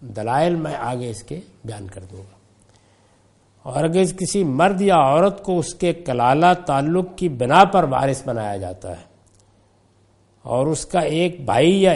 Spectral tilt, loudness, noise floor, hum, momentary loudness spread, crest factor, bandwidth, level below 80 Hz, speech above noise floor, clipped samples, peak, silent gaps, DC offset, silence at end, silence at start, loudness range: -5.5 dB/octave; -19 LUFS; -57 dBFS; none; 20 LU; 20 dB; 11.5 kHz; -48 dBFS; 38 dB; under 0.1%; 0 dBFS; none; under 0.1%; 0 s; 0 s; 9 LU